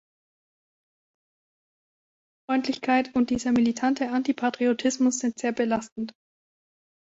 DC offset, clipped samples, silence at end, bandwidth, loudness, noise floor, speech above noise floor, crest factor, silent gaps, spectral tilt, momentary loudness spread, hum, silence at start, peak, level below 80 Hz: under 0.1%; under 0.1%; 0.95 s; 8 kHz; -25 LUFS; under -90 dBFS; over 65 dB; 18 dB; 5.92-5.96 s; -4 dB/octave; 5 LU; none; 2.5 s; -10 dBFS; -62 dBFS